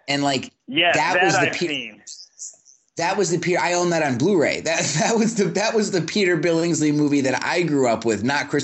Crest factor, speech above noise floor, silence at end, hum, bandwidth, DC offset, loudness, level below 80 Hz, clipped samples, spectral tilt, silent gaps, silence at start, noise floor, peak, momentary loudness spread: 14 dB; 27 dB; 0 s; none; 9.2 kHz; under 0.1%; -20 LUFS; -68 dBFS; under 0.1%; -4 dB/octave; none; 0.05 s; -48 dBFS; -6 dBFS; 11 LU